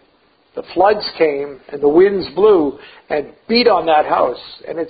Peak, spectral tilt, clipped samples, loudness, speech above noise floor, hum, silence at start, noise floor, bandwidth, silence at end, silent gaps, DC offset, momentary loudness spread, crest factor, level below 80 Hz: 0 dBFS; -10 dB/octave; under 0.1%; -15 LUFS; 41 dB; none; 0.55 s; -56 dBFS; 5 kHz; 0 s; none; under 0.1%; 15 LU; 16 dB; -50 dBFS